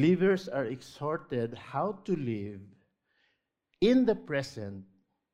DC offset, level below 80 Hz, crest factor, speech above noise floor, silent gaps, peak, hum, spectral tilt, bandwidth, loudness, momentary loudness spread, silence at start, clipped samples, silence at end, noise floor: under 0.1%; -62 dBFS; 18 dB; 48 dB; none; -14 dBFS; none; -7 dB/octave; 11 kHz; -31 LUFS; 17 LU; 0 s; under 0.1%; 0.5 s; -78 dBFS